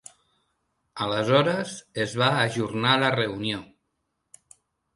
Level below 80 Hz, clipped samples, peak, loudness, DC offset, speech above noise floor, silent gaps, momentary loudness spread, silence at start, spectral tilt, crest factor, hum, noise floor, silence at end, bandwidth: -62 dBFS; under 0.1%; -4 dBFS; -24 LUFS; under 0.1%; 53 dB; none; 11 LU; 0.95 s; -5 dB/octave; 22 dB; none; -77 dBFS; 1.3 s; 11.5 kHz